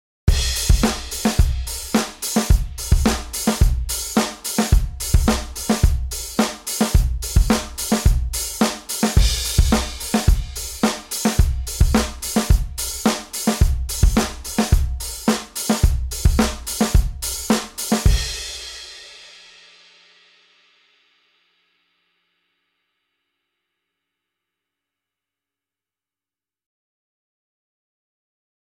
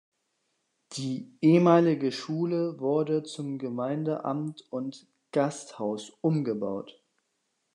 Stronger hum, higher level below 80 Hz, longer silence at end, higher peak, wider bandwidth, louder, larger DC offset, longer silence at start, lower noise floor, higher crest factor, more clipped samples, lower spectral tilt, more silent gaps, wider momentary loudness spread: neither; first, -24 dBFS vs -82 dBFS; first, 9.35 s vs 0.85 s; first, -2 dBFS vs -8 dBFS; first, 17.5 kHz vs 10.5 kHz; first, -21 LUFS vs -28 LUFS; neither; second, 0.25 s vs 0.9 s; first, under -90 dBFS vs -78 dBFS; about the same, 20 dB vs 22 dB; neither; second, -4.5 dB/octave vs -7 dB/octave; neither; second, 6 LU vs 15 LU